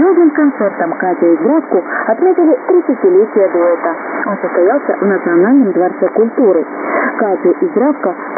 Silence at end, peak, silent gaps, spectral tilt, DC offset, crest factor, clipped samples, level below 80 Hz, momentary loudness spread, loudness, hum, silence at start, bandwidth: 0 s; 0 dBFS; none; -16 dB/octave; under 0.1%; 10 dB; under 0.1%; -78 dBFS; 6 LU; -12 LUFS; none; 0 s; 2.5 kHz